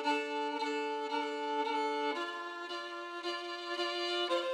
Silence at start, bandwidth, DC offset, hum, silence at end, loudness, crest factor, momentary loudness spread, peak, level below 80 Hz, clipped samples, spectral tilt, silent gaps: 0 s; 15 kHz; under 0.1%; none; 0 s; -36 LUFS; 14 dB; 7 LU; -22 dBFS; under -90 dBFS; under 0.1%; -0.5 dB/octave; none